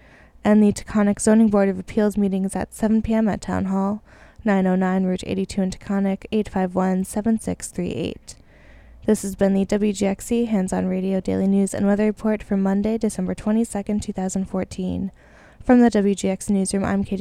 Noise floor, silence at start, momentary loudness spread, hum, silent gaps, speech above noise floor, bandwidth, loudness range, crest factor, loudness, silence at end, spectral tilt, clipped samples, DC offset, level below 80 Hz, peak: -47 dBFS; 0.45 s; 9 LU; none; none; 27 dB; 13.5 kHz; 4 LU; 18 dB; -21 LUFS; 0 s; -6.5 dB/octave; under 0.1%; under 0.1%; -44 dBFS; -2 dBFS